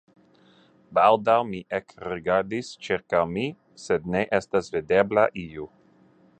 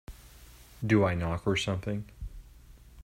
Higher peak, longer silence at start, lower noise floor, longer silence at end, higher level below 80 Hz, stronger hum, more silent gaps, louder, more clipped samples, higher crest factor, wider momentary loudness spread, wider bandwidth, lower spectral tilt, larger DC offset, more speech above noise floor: first, -4 dBFS vs -12 dBFS; first, 0.9 s vs 0.1 s; first, -58 dBFS vs -53 dBFS; first, 0.75 s vs 0 s; second, -58 dBFS vs -48 dBFS; neither; neither; first, -24 LUFS vs -30 LUFS; neither; about the same, 22 dB vs 20 dB; second, 14 LU vs 21 LU; second, 9.2 kHz vs 16 kHz; about the same, -5.5 dB/octave vs -6 dB/octave; neither; first, 34 dB vs 24 dB